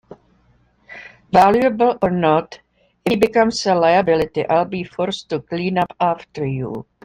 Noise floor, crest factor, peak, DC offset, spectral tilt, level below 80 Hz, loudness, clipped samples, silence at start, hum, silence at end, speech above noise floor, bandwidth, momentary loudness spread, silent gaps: -57 dBFS; 16 dB; -2 dBFS; under 0.1%; -6 dB/octave; -50 dBFS; -18 LUFS; under 0.1%; 0.1 s; none; 0.25 s; 40 dB; 16 kHz; 12 LU; none